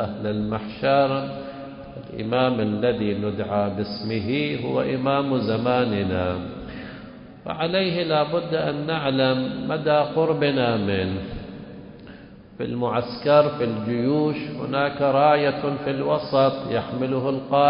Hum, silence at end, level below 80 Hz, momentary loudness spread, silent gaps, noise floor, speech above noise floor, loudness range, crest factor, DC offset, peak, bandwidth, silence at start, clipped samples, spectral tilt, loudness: none; 0 s; -48 dBFS; 16 LU; none; -43 dBFS; 21 dB; 3 LU; 18 dB; under 0.1%; -6 dBFS; 5.4 kHz; 0 s; under 0.1%; -11 dB/octave; -23 LUFS